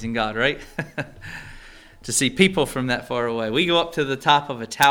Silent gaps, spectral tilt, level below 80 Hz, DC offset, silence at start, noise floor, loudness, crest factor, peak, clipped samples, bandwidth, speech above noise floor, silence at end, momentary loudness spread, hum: none; -3.5 dB/octave; -46 dBFS; under 0.1%; 0 s; -44 dBFS; -21 LUFS; 20 dB; -2 dBFS; under 0.1%; over 20 kHz; 22 dB; 0 s; 18 LU; none